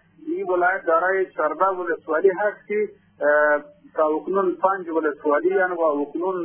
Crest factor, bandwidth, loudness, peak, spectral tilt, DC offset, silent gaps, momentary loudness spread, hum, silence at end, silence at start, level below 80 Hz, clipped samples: 16 dB; 3.4 kHz; -22 LUFS; -6 dBFS; -9.5 dB/octave; under 0.1%; none; 7 LU; none; 0 s; 0.25 s; -72 dBFS; under 0.1%